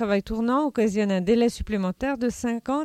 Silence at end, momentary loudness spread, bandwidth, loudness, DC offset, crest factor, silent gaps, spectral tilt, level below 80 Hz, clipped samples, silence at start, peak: 0 s; 6 LU; 14 kHz; -24 LUFS; under 0.1%; 14 dB; none; -6 dB/octave; -44 dBFS; under 0.1%; 0 s; -10 dBFS